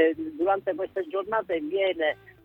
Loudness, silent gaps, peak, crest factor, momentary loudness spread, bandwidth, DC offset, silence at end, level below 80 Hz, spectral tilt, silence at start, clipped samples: -27 LUFS; none; -8 dBFS; 18 dB; 5 LU; 4.2 kHz; under 0.1%; 0.15 s; -66 dBFS; -6.5 dB/octave; 0 s; under 0.1%